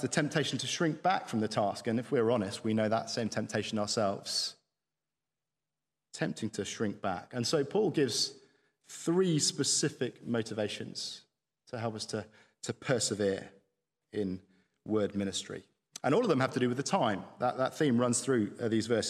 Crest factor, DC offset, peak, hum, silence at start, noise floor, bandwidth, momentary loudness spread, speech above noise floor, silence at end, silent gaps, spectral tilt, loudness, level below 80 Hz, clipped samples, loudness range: 20 dB; under 0.1%; -12 dBFS; none; 0 s; under -90 dBFS; 14 kHz; 10 LU; over 58 dB; 0 s; none; -4 dB/octave; -32 LUFS; -76 dBFS; under 0.1%; 5 LU